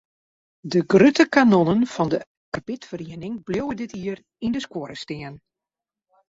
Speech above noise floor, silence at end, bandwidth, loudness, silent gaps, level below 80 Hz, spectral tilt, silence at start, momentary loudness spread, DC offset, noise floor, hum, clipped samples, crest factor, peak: 68 dB; 0.95 s; 7.8 kHz; -21 LUFS; 2.27-2.52 s; -58 dBFS; -6 dB/octave; 0.65 s; 18 LU; under 0.1%; -89 dBFS; none; under 0.1%; 20 dB; -2 dBFS